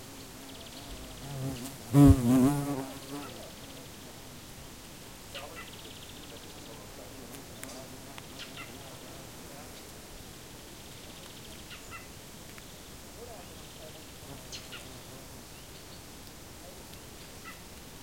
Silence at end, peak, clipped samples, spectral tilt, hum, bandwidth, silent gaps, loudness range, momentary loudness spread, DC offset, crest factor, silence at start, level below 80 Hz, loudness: 0 s; -8 dBFS; under 0.1%; -6 dB/octave; none; 16.5 kHz; none; 18 LU; 14 LU; 0.1%; 26 dB; 0 s; -48 dBFS; -32 LUFS